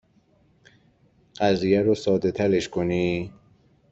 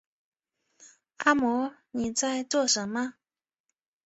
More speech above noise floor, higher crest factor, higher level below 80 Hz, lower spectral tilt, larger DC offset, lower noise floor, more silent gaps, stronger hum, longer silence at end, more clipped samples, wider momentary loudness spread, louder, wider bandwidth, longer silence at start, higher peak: second, 39 dB vs 57 dB; about the same, 18 dB vs 22 dB; first, -56 dBFS vs -66 dBFS; first, -6.5 dB/octave vs -2 dB/octave; neither; second, -61 dBFS vs -84 dBFS; neither; neither; second, 0.6 s vs 0.95 s; neither; second, 6 LU vs 9 LU; first, -23 LUFS vs -27 LUFS; about the same, 8 kHz vs 8.4 kHz; first, 1.4 s vs 0.8 s; about the same, -8 dBFS vs -8 dBFS